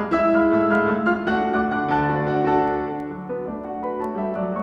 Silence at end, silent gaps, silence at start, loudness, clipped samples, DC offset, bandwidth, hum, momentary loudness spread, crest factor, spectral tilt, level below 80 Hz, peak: 0 s; none; 0 s; -22 LUFS; under 0.1%; under 0.1%; 7.4 kHz; none; 11 LU; 14 dB; -8.5 dB/octave; -48 dBFS; -8 dBFS